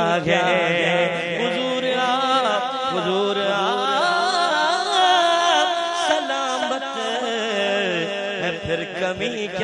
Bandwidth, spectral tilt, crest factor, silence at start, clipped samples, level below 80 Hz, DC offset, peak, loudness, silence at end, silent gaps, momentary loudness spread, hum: 11 kHz; -3.5 dB/octave; 16 dB; 0 s; under 0.1%; -60 dBFS; under 0.1%; -4 dBFS; -20 LUFS; 0 s; none; 7 LU; none